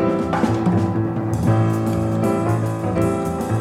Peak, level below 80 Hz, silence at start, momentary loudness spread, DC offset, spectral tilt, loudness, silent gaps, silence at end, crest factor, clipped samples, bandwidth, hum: -6 dBFS; -44 dBFS; 0 s; 4 LU; under 0.1%; -8 dB/octave; -20 LUFS; none; 0 s; 14 dB; under 0.1%; 15 kHz; none